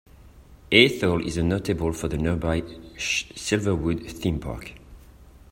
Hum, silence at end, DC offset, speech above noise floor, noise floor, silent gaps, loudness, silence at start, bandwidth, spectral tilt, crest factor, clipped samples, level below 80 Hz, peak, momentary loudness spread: none; 0.2 s; under 0.1%; 25 dB; -49 dBFS; none; -24 LUFS; 0.25 s; 16 kHz; -4.5 dB/octave; 24 dB; under 0.1%; -42 dBFS; 0 dBFS; 14 LU